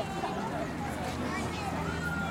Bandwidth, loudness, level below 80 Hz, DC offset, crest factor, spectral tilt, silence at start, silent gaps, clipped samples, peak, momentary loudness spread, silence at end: 16.5 kHz; -34 LUFS; -52 dBFS; under 0.1%; 12 dB; -5.5 dB/octave; 0 s; none; under 0.1%; -22 dBFS; 2 LU; 0 s